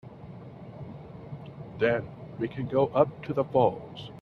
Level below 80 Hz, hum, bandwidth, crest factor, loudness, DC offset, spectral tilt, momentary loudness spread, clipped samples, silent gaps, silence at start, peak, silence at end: -60 dBFS; none; 6.4 kHz; 22 dB; -27 LUFS; under 0.1%; -9 dB/octave; 20 LU; under 0.1%; none; 0.05 s; -8 dBFS; 0 s